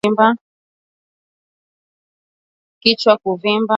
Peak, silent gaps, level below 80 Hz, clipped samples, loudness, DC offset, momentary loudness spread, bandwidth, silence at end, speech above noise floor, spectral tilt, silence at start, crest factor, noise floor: 0 dBFS; 0.41-2.81 s; -66 dBFS; under 0.1%; -15 LUFS; under 0.1%; 4 LU; 10 kHz; 0 s; over 75 dB; -5.5 dB/octave; 0.05 s; 20 dB; under -90 dBFS